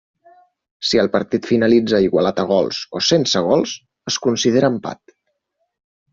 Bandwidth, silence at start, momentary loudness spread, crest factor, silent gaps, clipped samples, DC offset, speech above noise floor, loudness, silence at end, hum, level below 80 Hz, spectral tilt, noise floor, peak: 7.8 kHz; 0.8 s; 11 LU; 16 dB; none; under 0.1%; under 0.1%; 55 dB; -17 LUFS; 1.2 s; none; -54 dBFS; -4.5 dB/octave; -72 dBFS; -2 dBFS